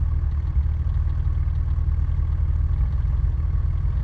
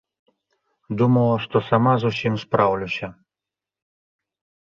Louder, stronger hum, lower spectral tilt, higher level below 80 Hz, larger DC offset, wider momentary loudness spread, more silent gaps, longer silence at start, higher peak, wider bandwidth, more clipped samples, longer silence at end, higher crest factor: second, -24 LUFS vs -20 LUFS; neither; first, -10 dB/octave vs -8 dB/octave; first, -22 dBFS vs -56 dBFS; neither; second, 1 LU vs 11 LU; neither; second, 0 s vs 0.9 s; second, -12 dBFS vs -2 dBFS; second, 3.4 kHz vs 7 kHz; neither; second, 0 s vs 1.55 s; second, 10 dB vs 20 dB